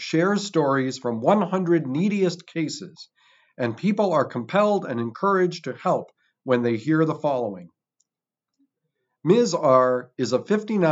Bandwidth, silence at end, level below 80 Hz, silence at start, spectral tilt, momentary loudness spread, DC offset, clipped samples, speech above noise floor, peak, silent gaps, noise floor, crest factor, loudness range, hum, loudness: 8 kHz; 0 s; -88 dBFS; 0 s; -6.5 dB/octave; 10 LU; under 0.1%; under 0.1%; 66 dB; -4 dBFS; none; -88 dBFS; 20 dB; 3 LU; none; -23 LUFS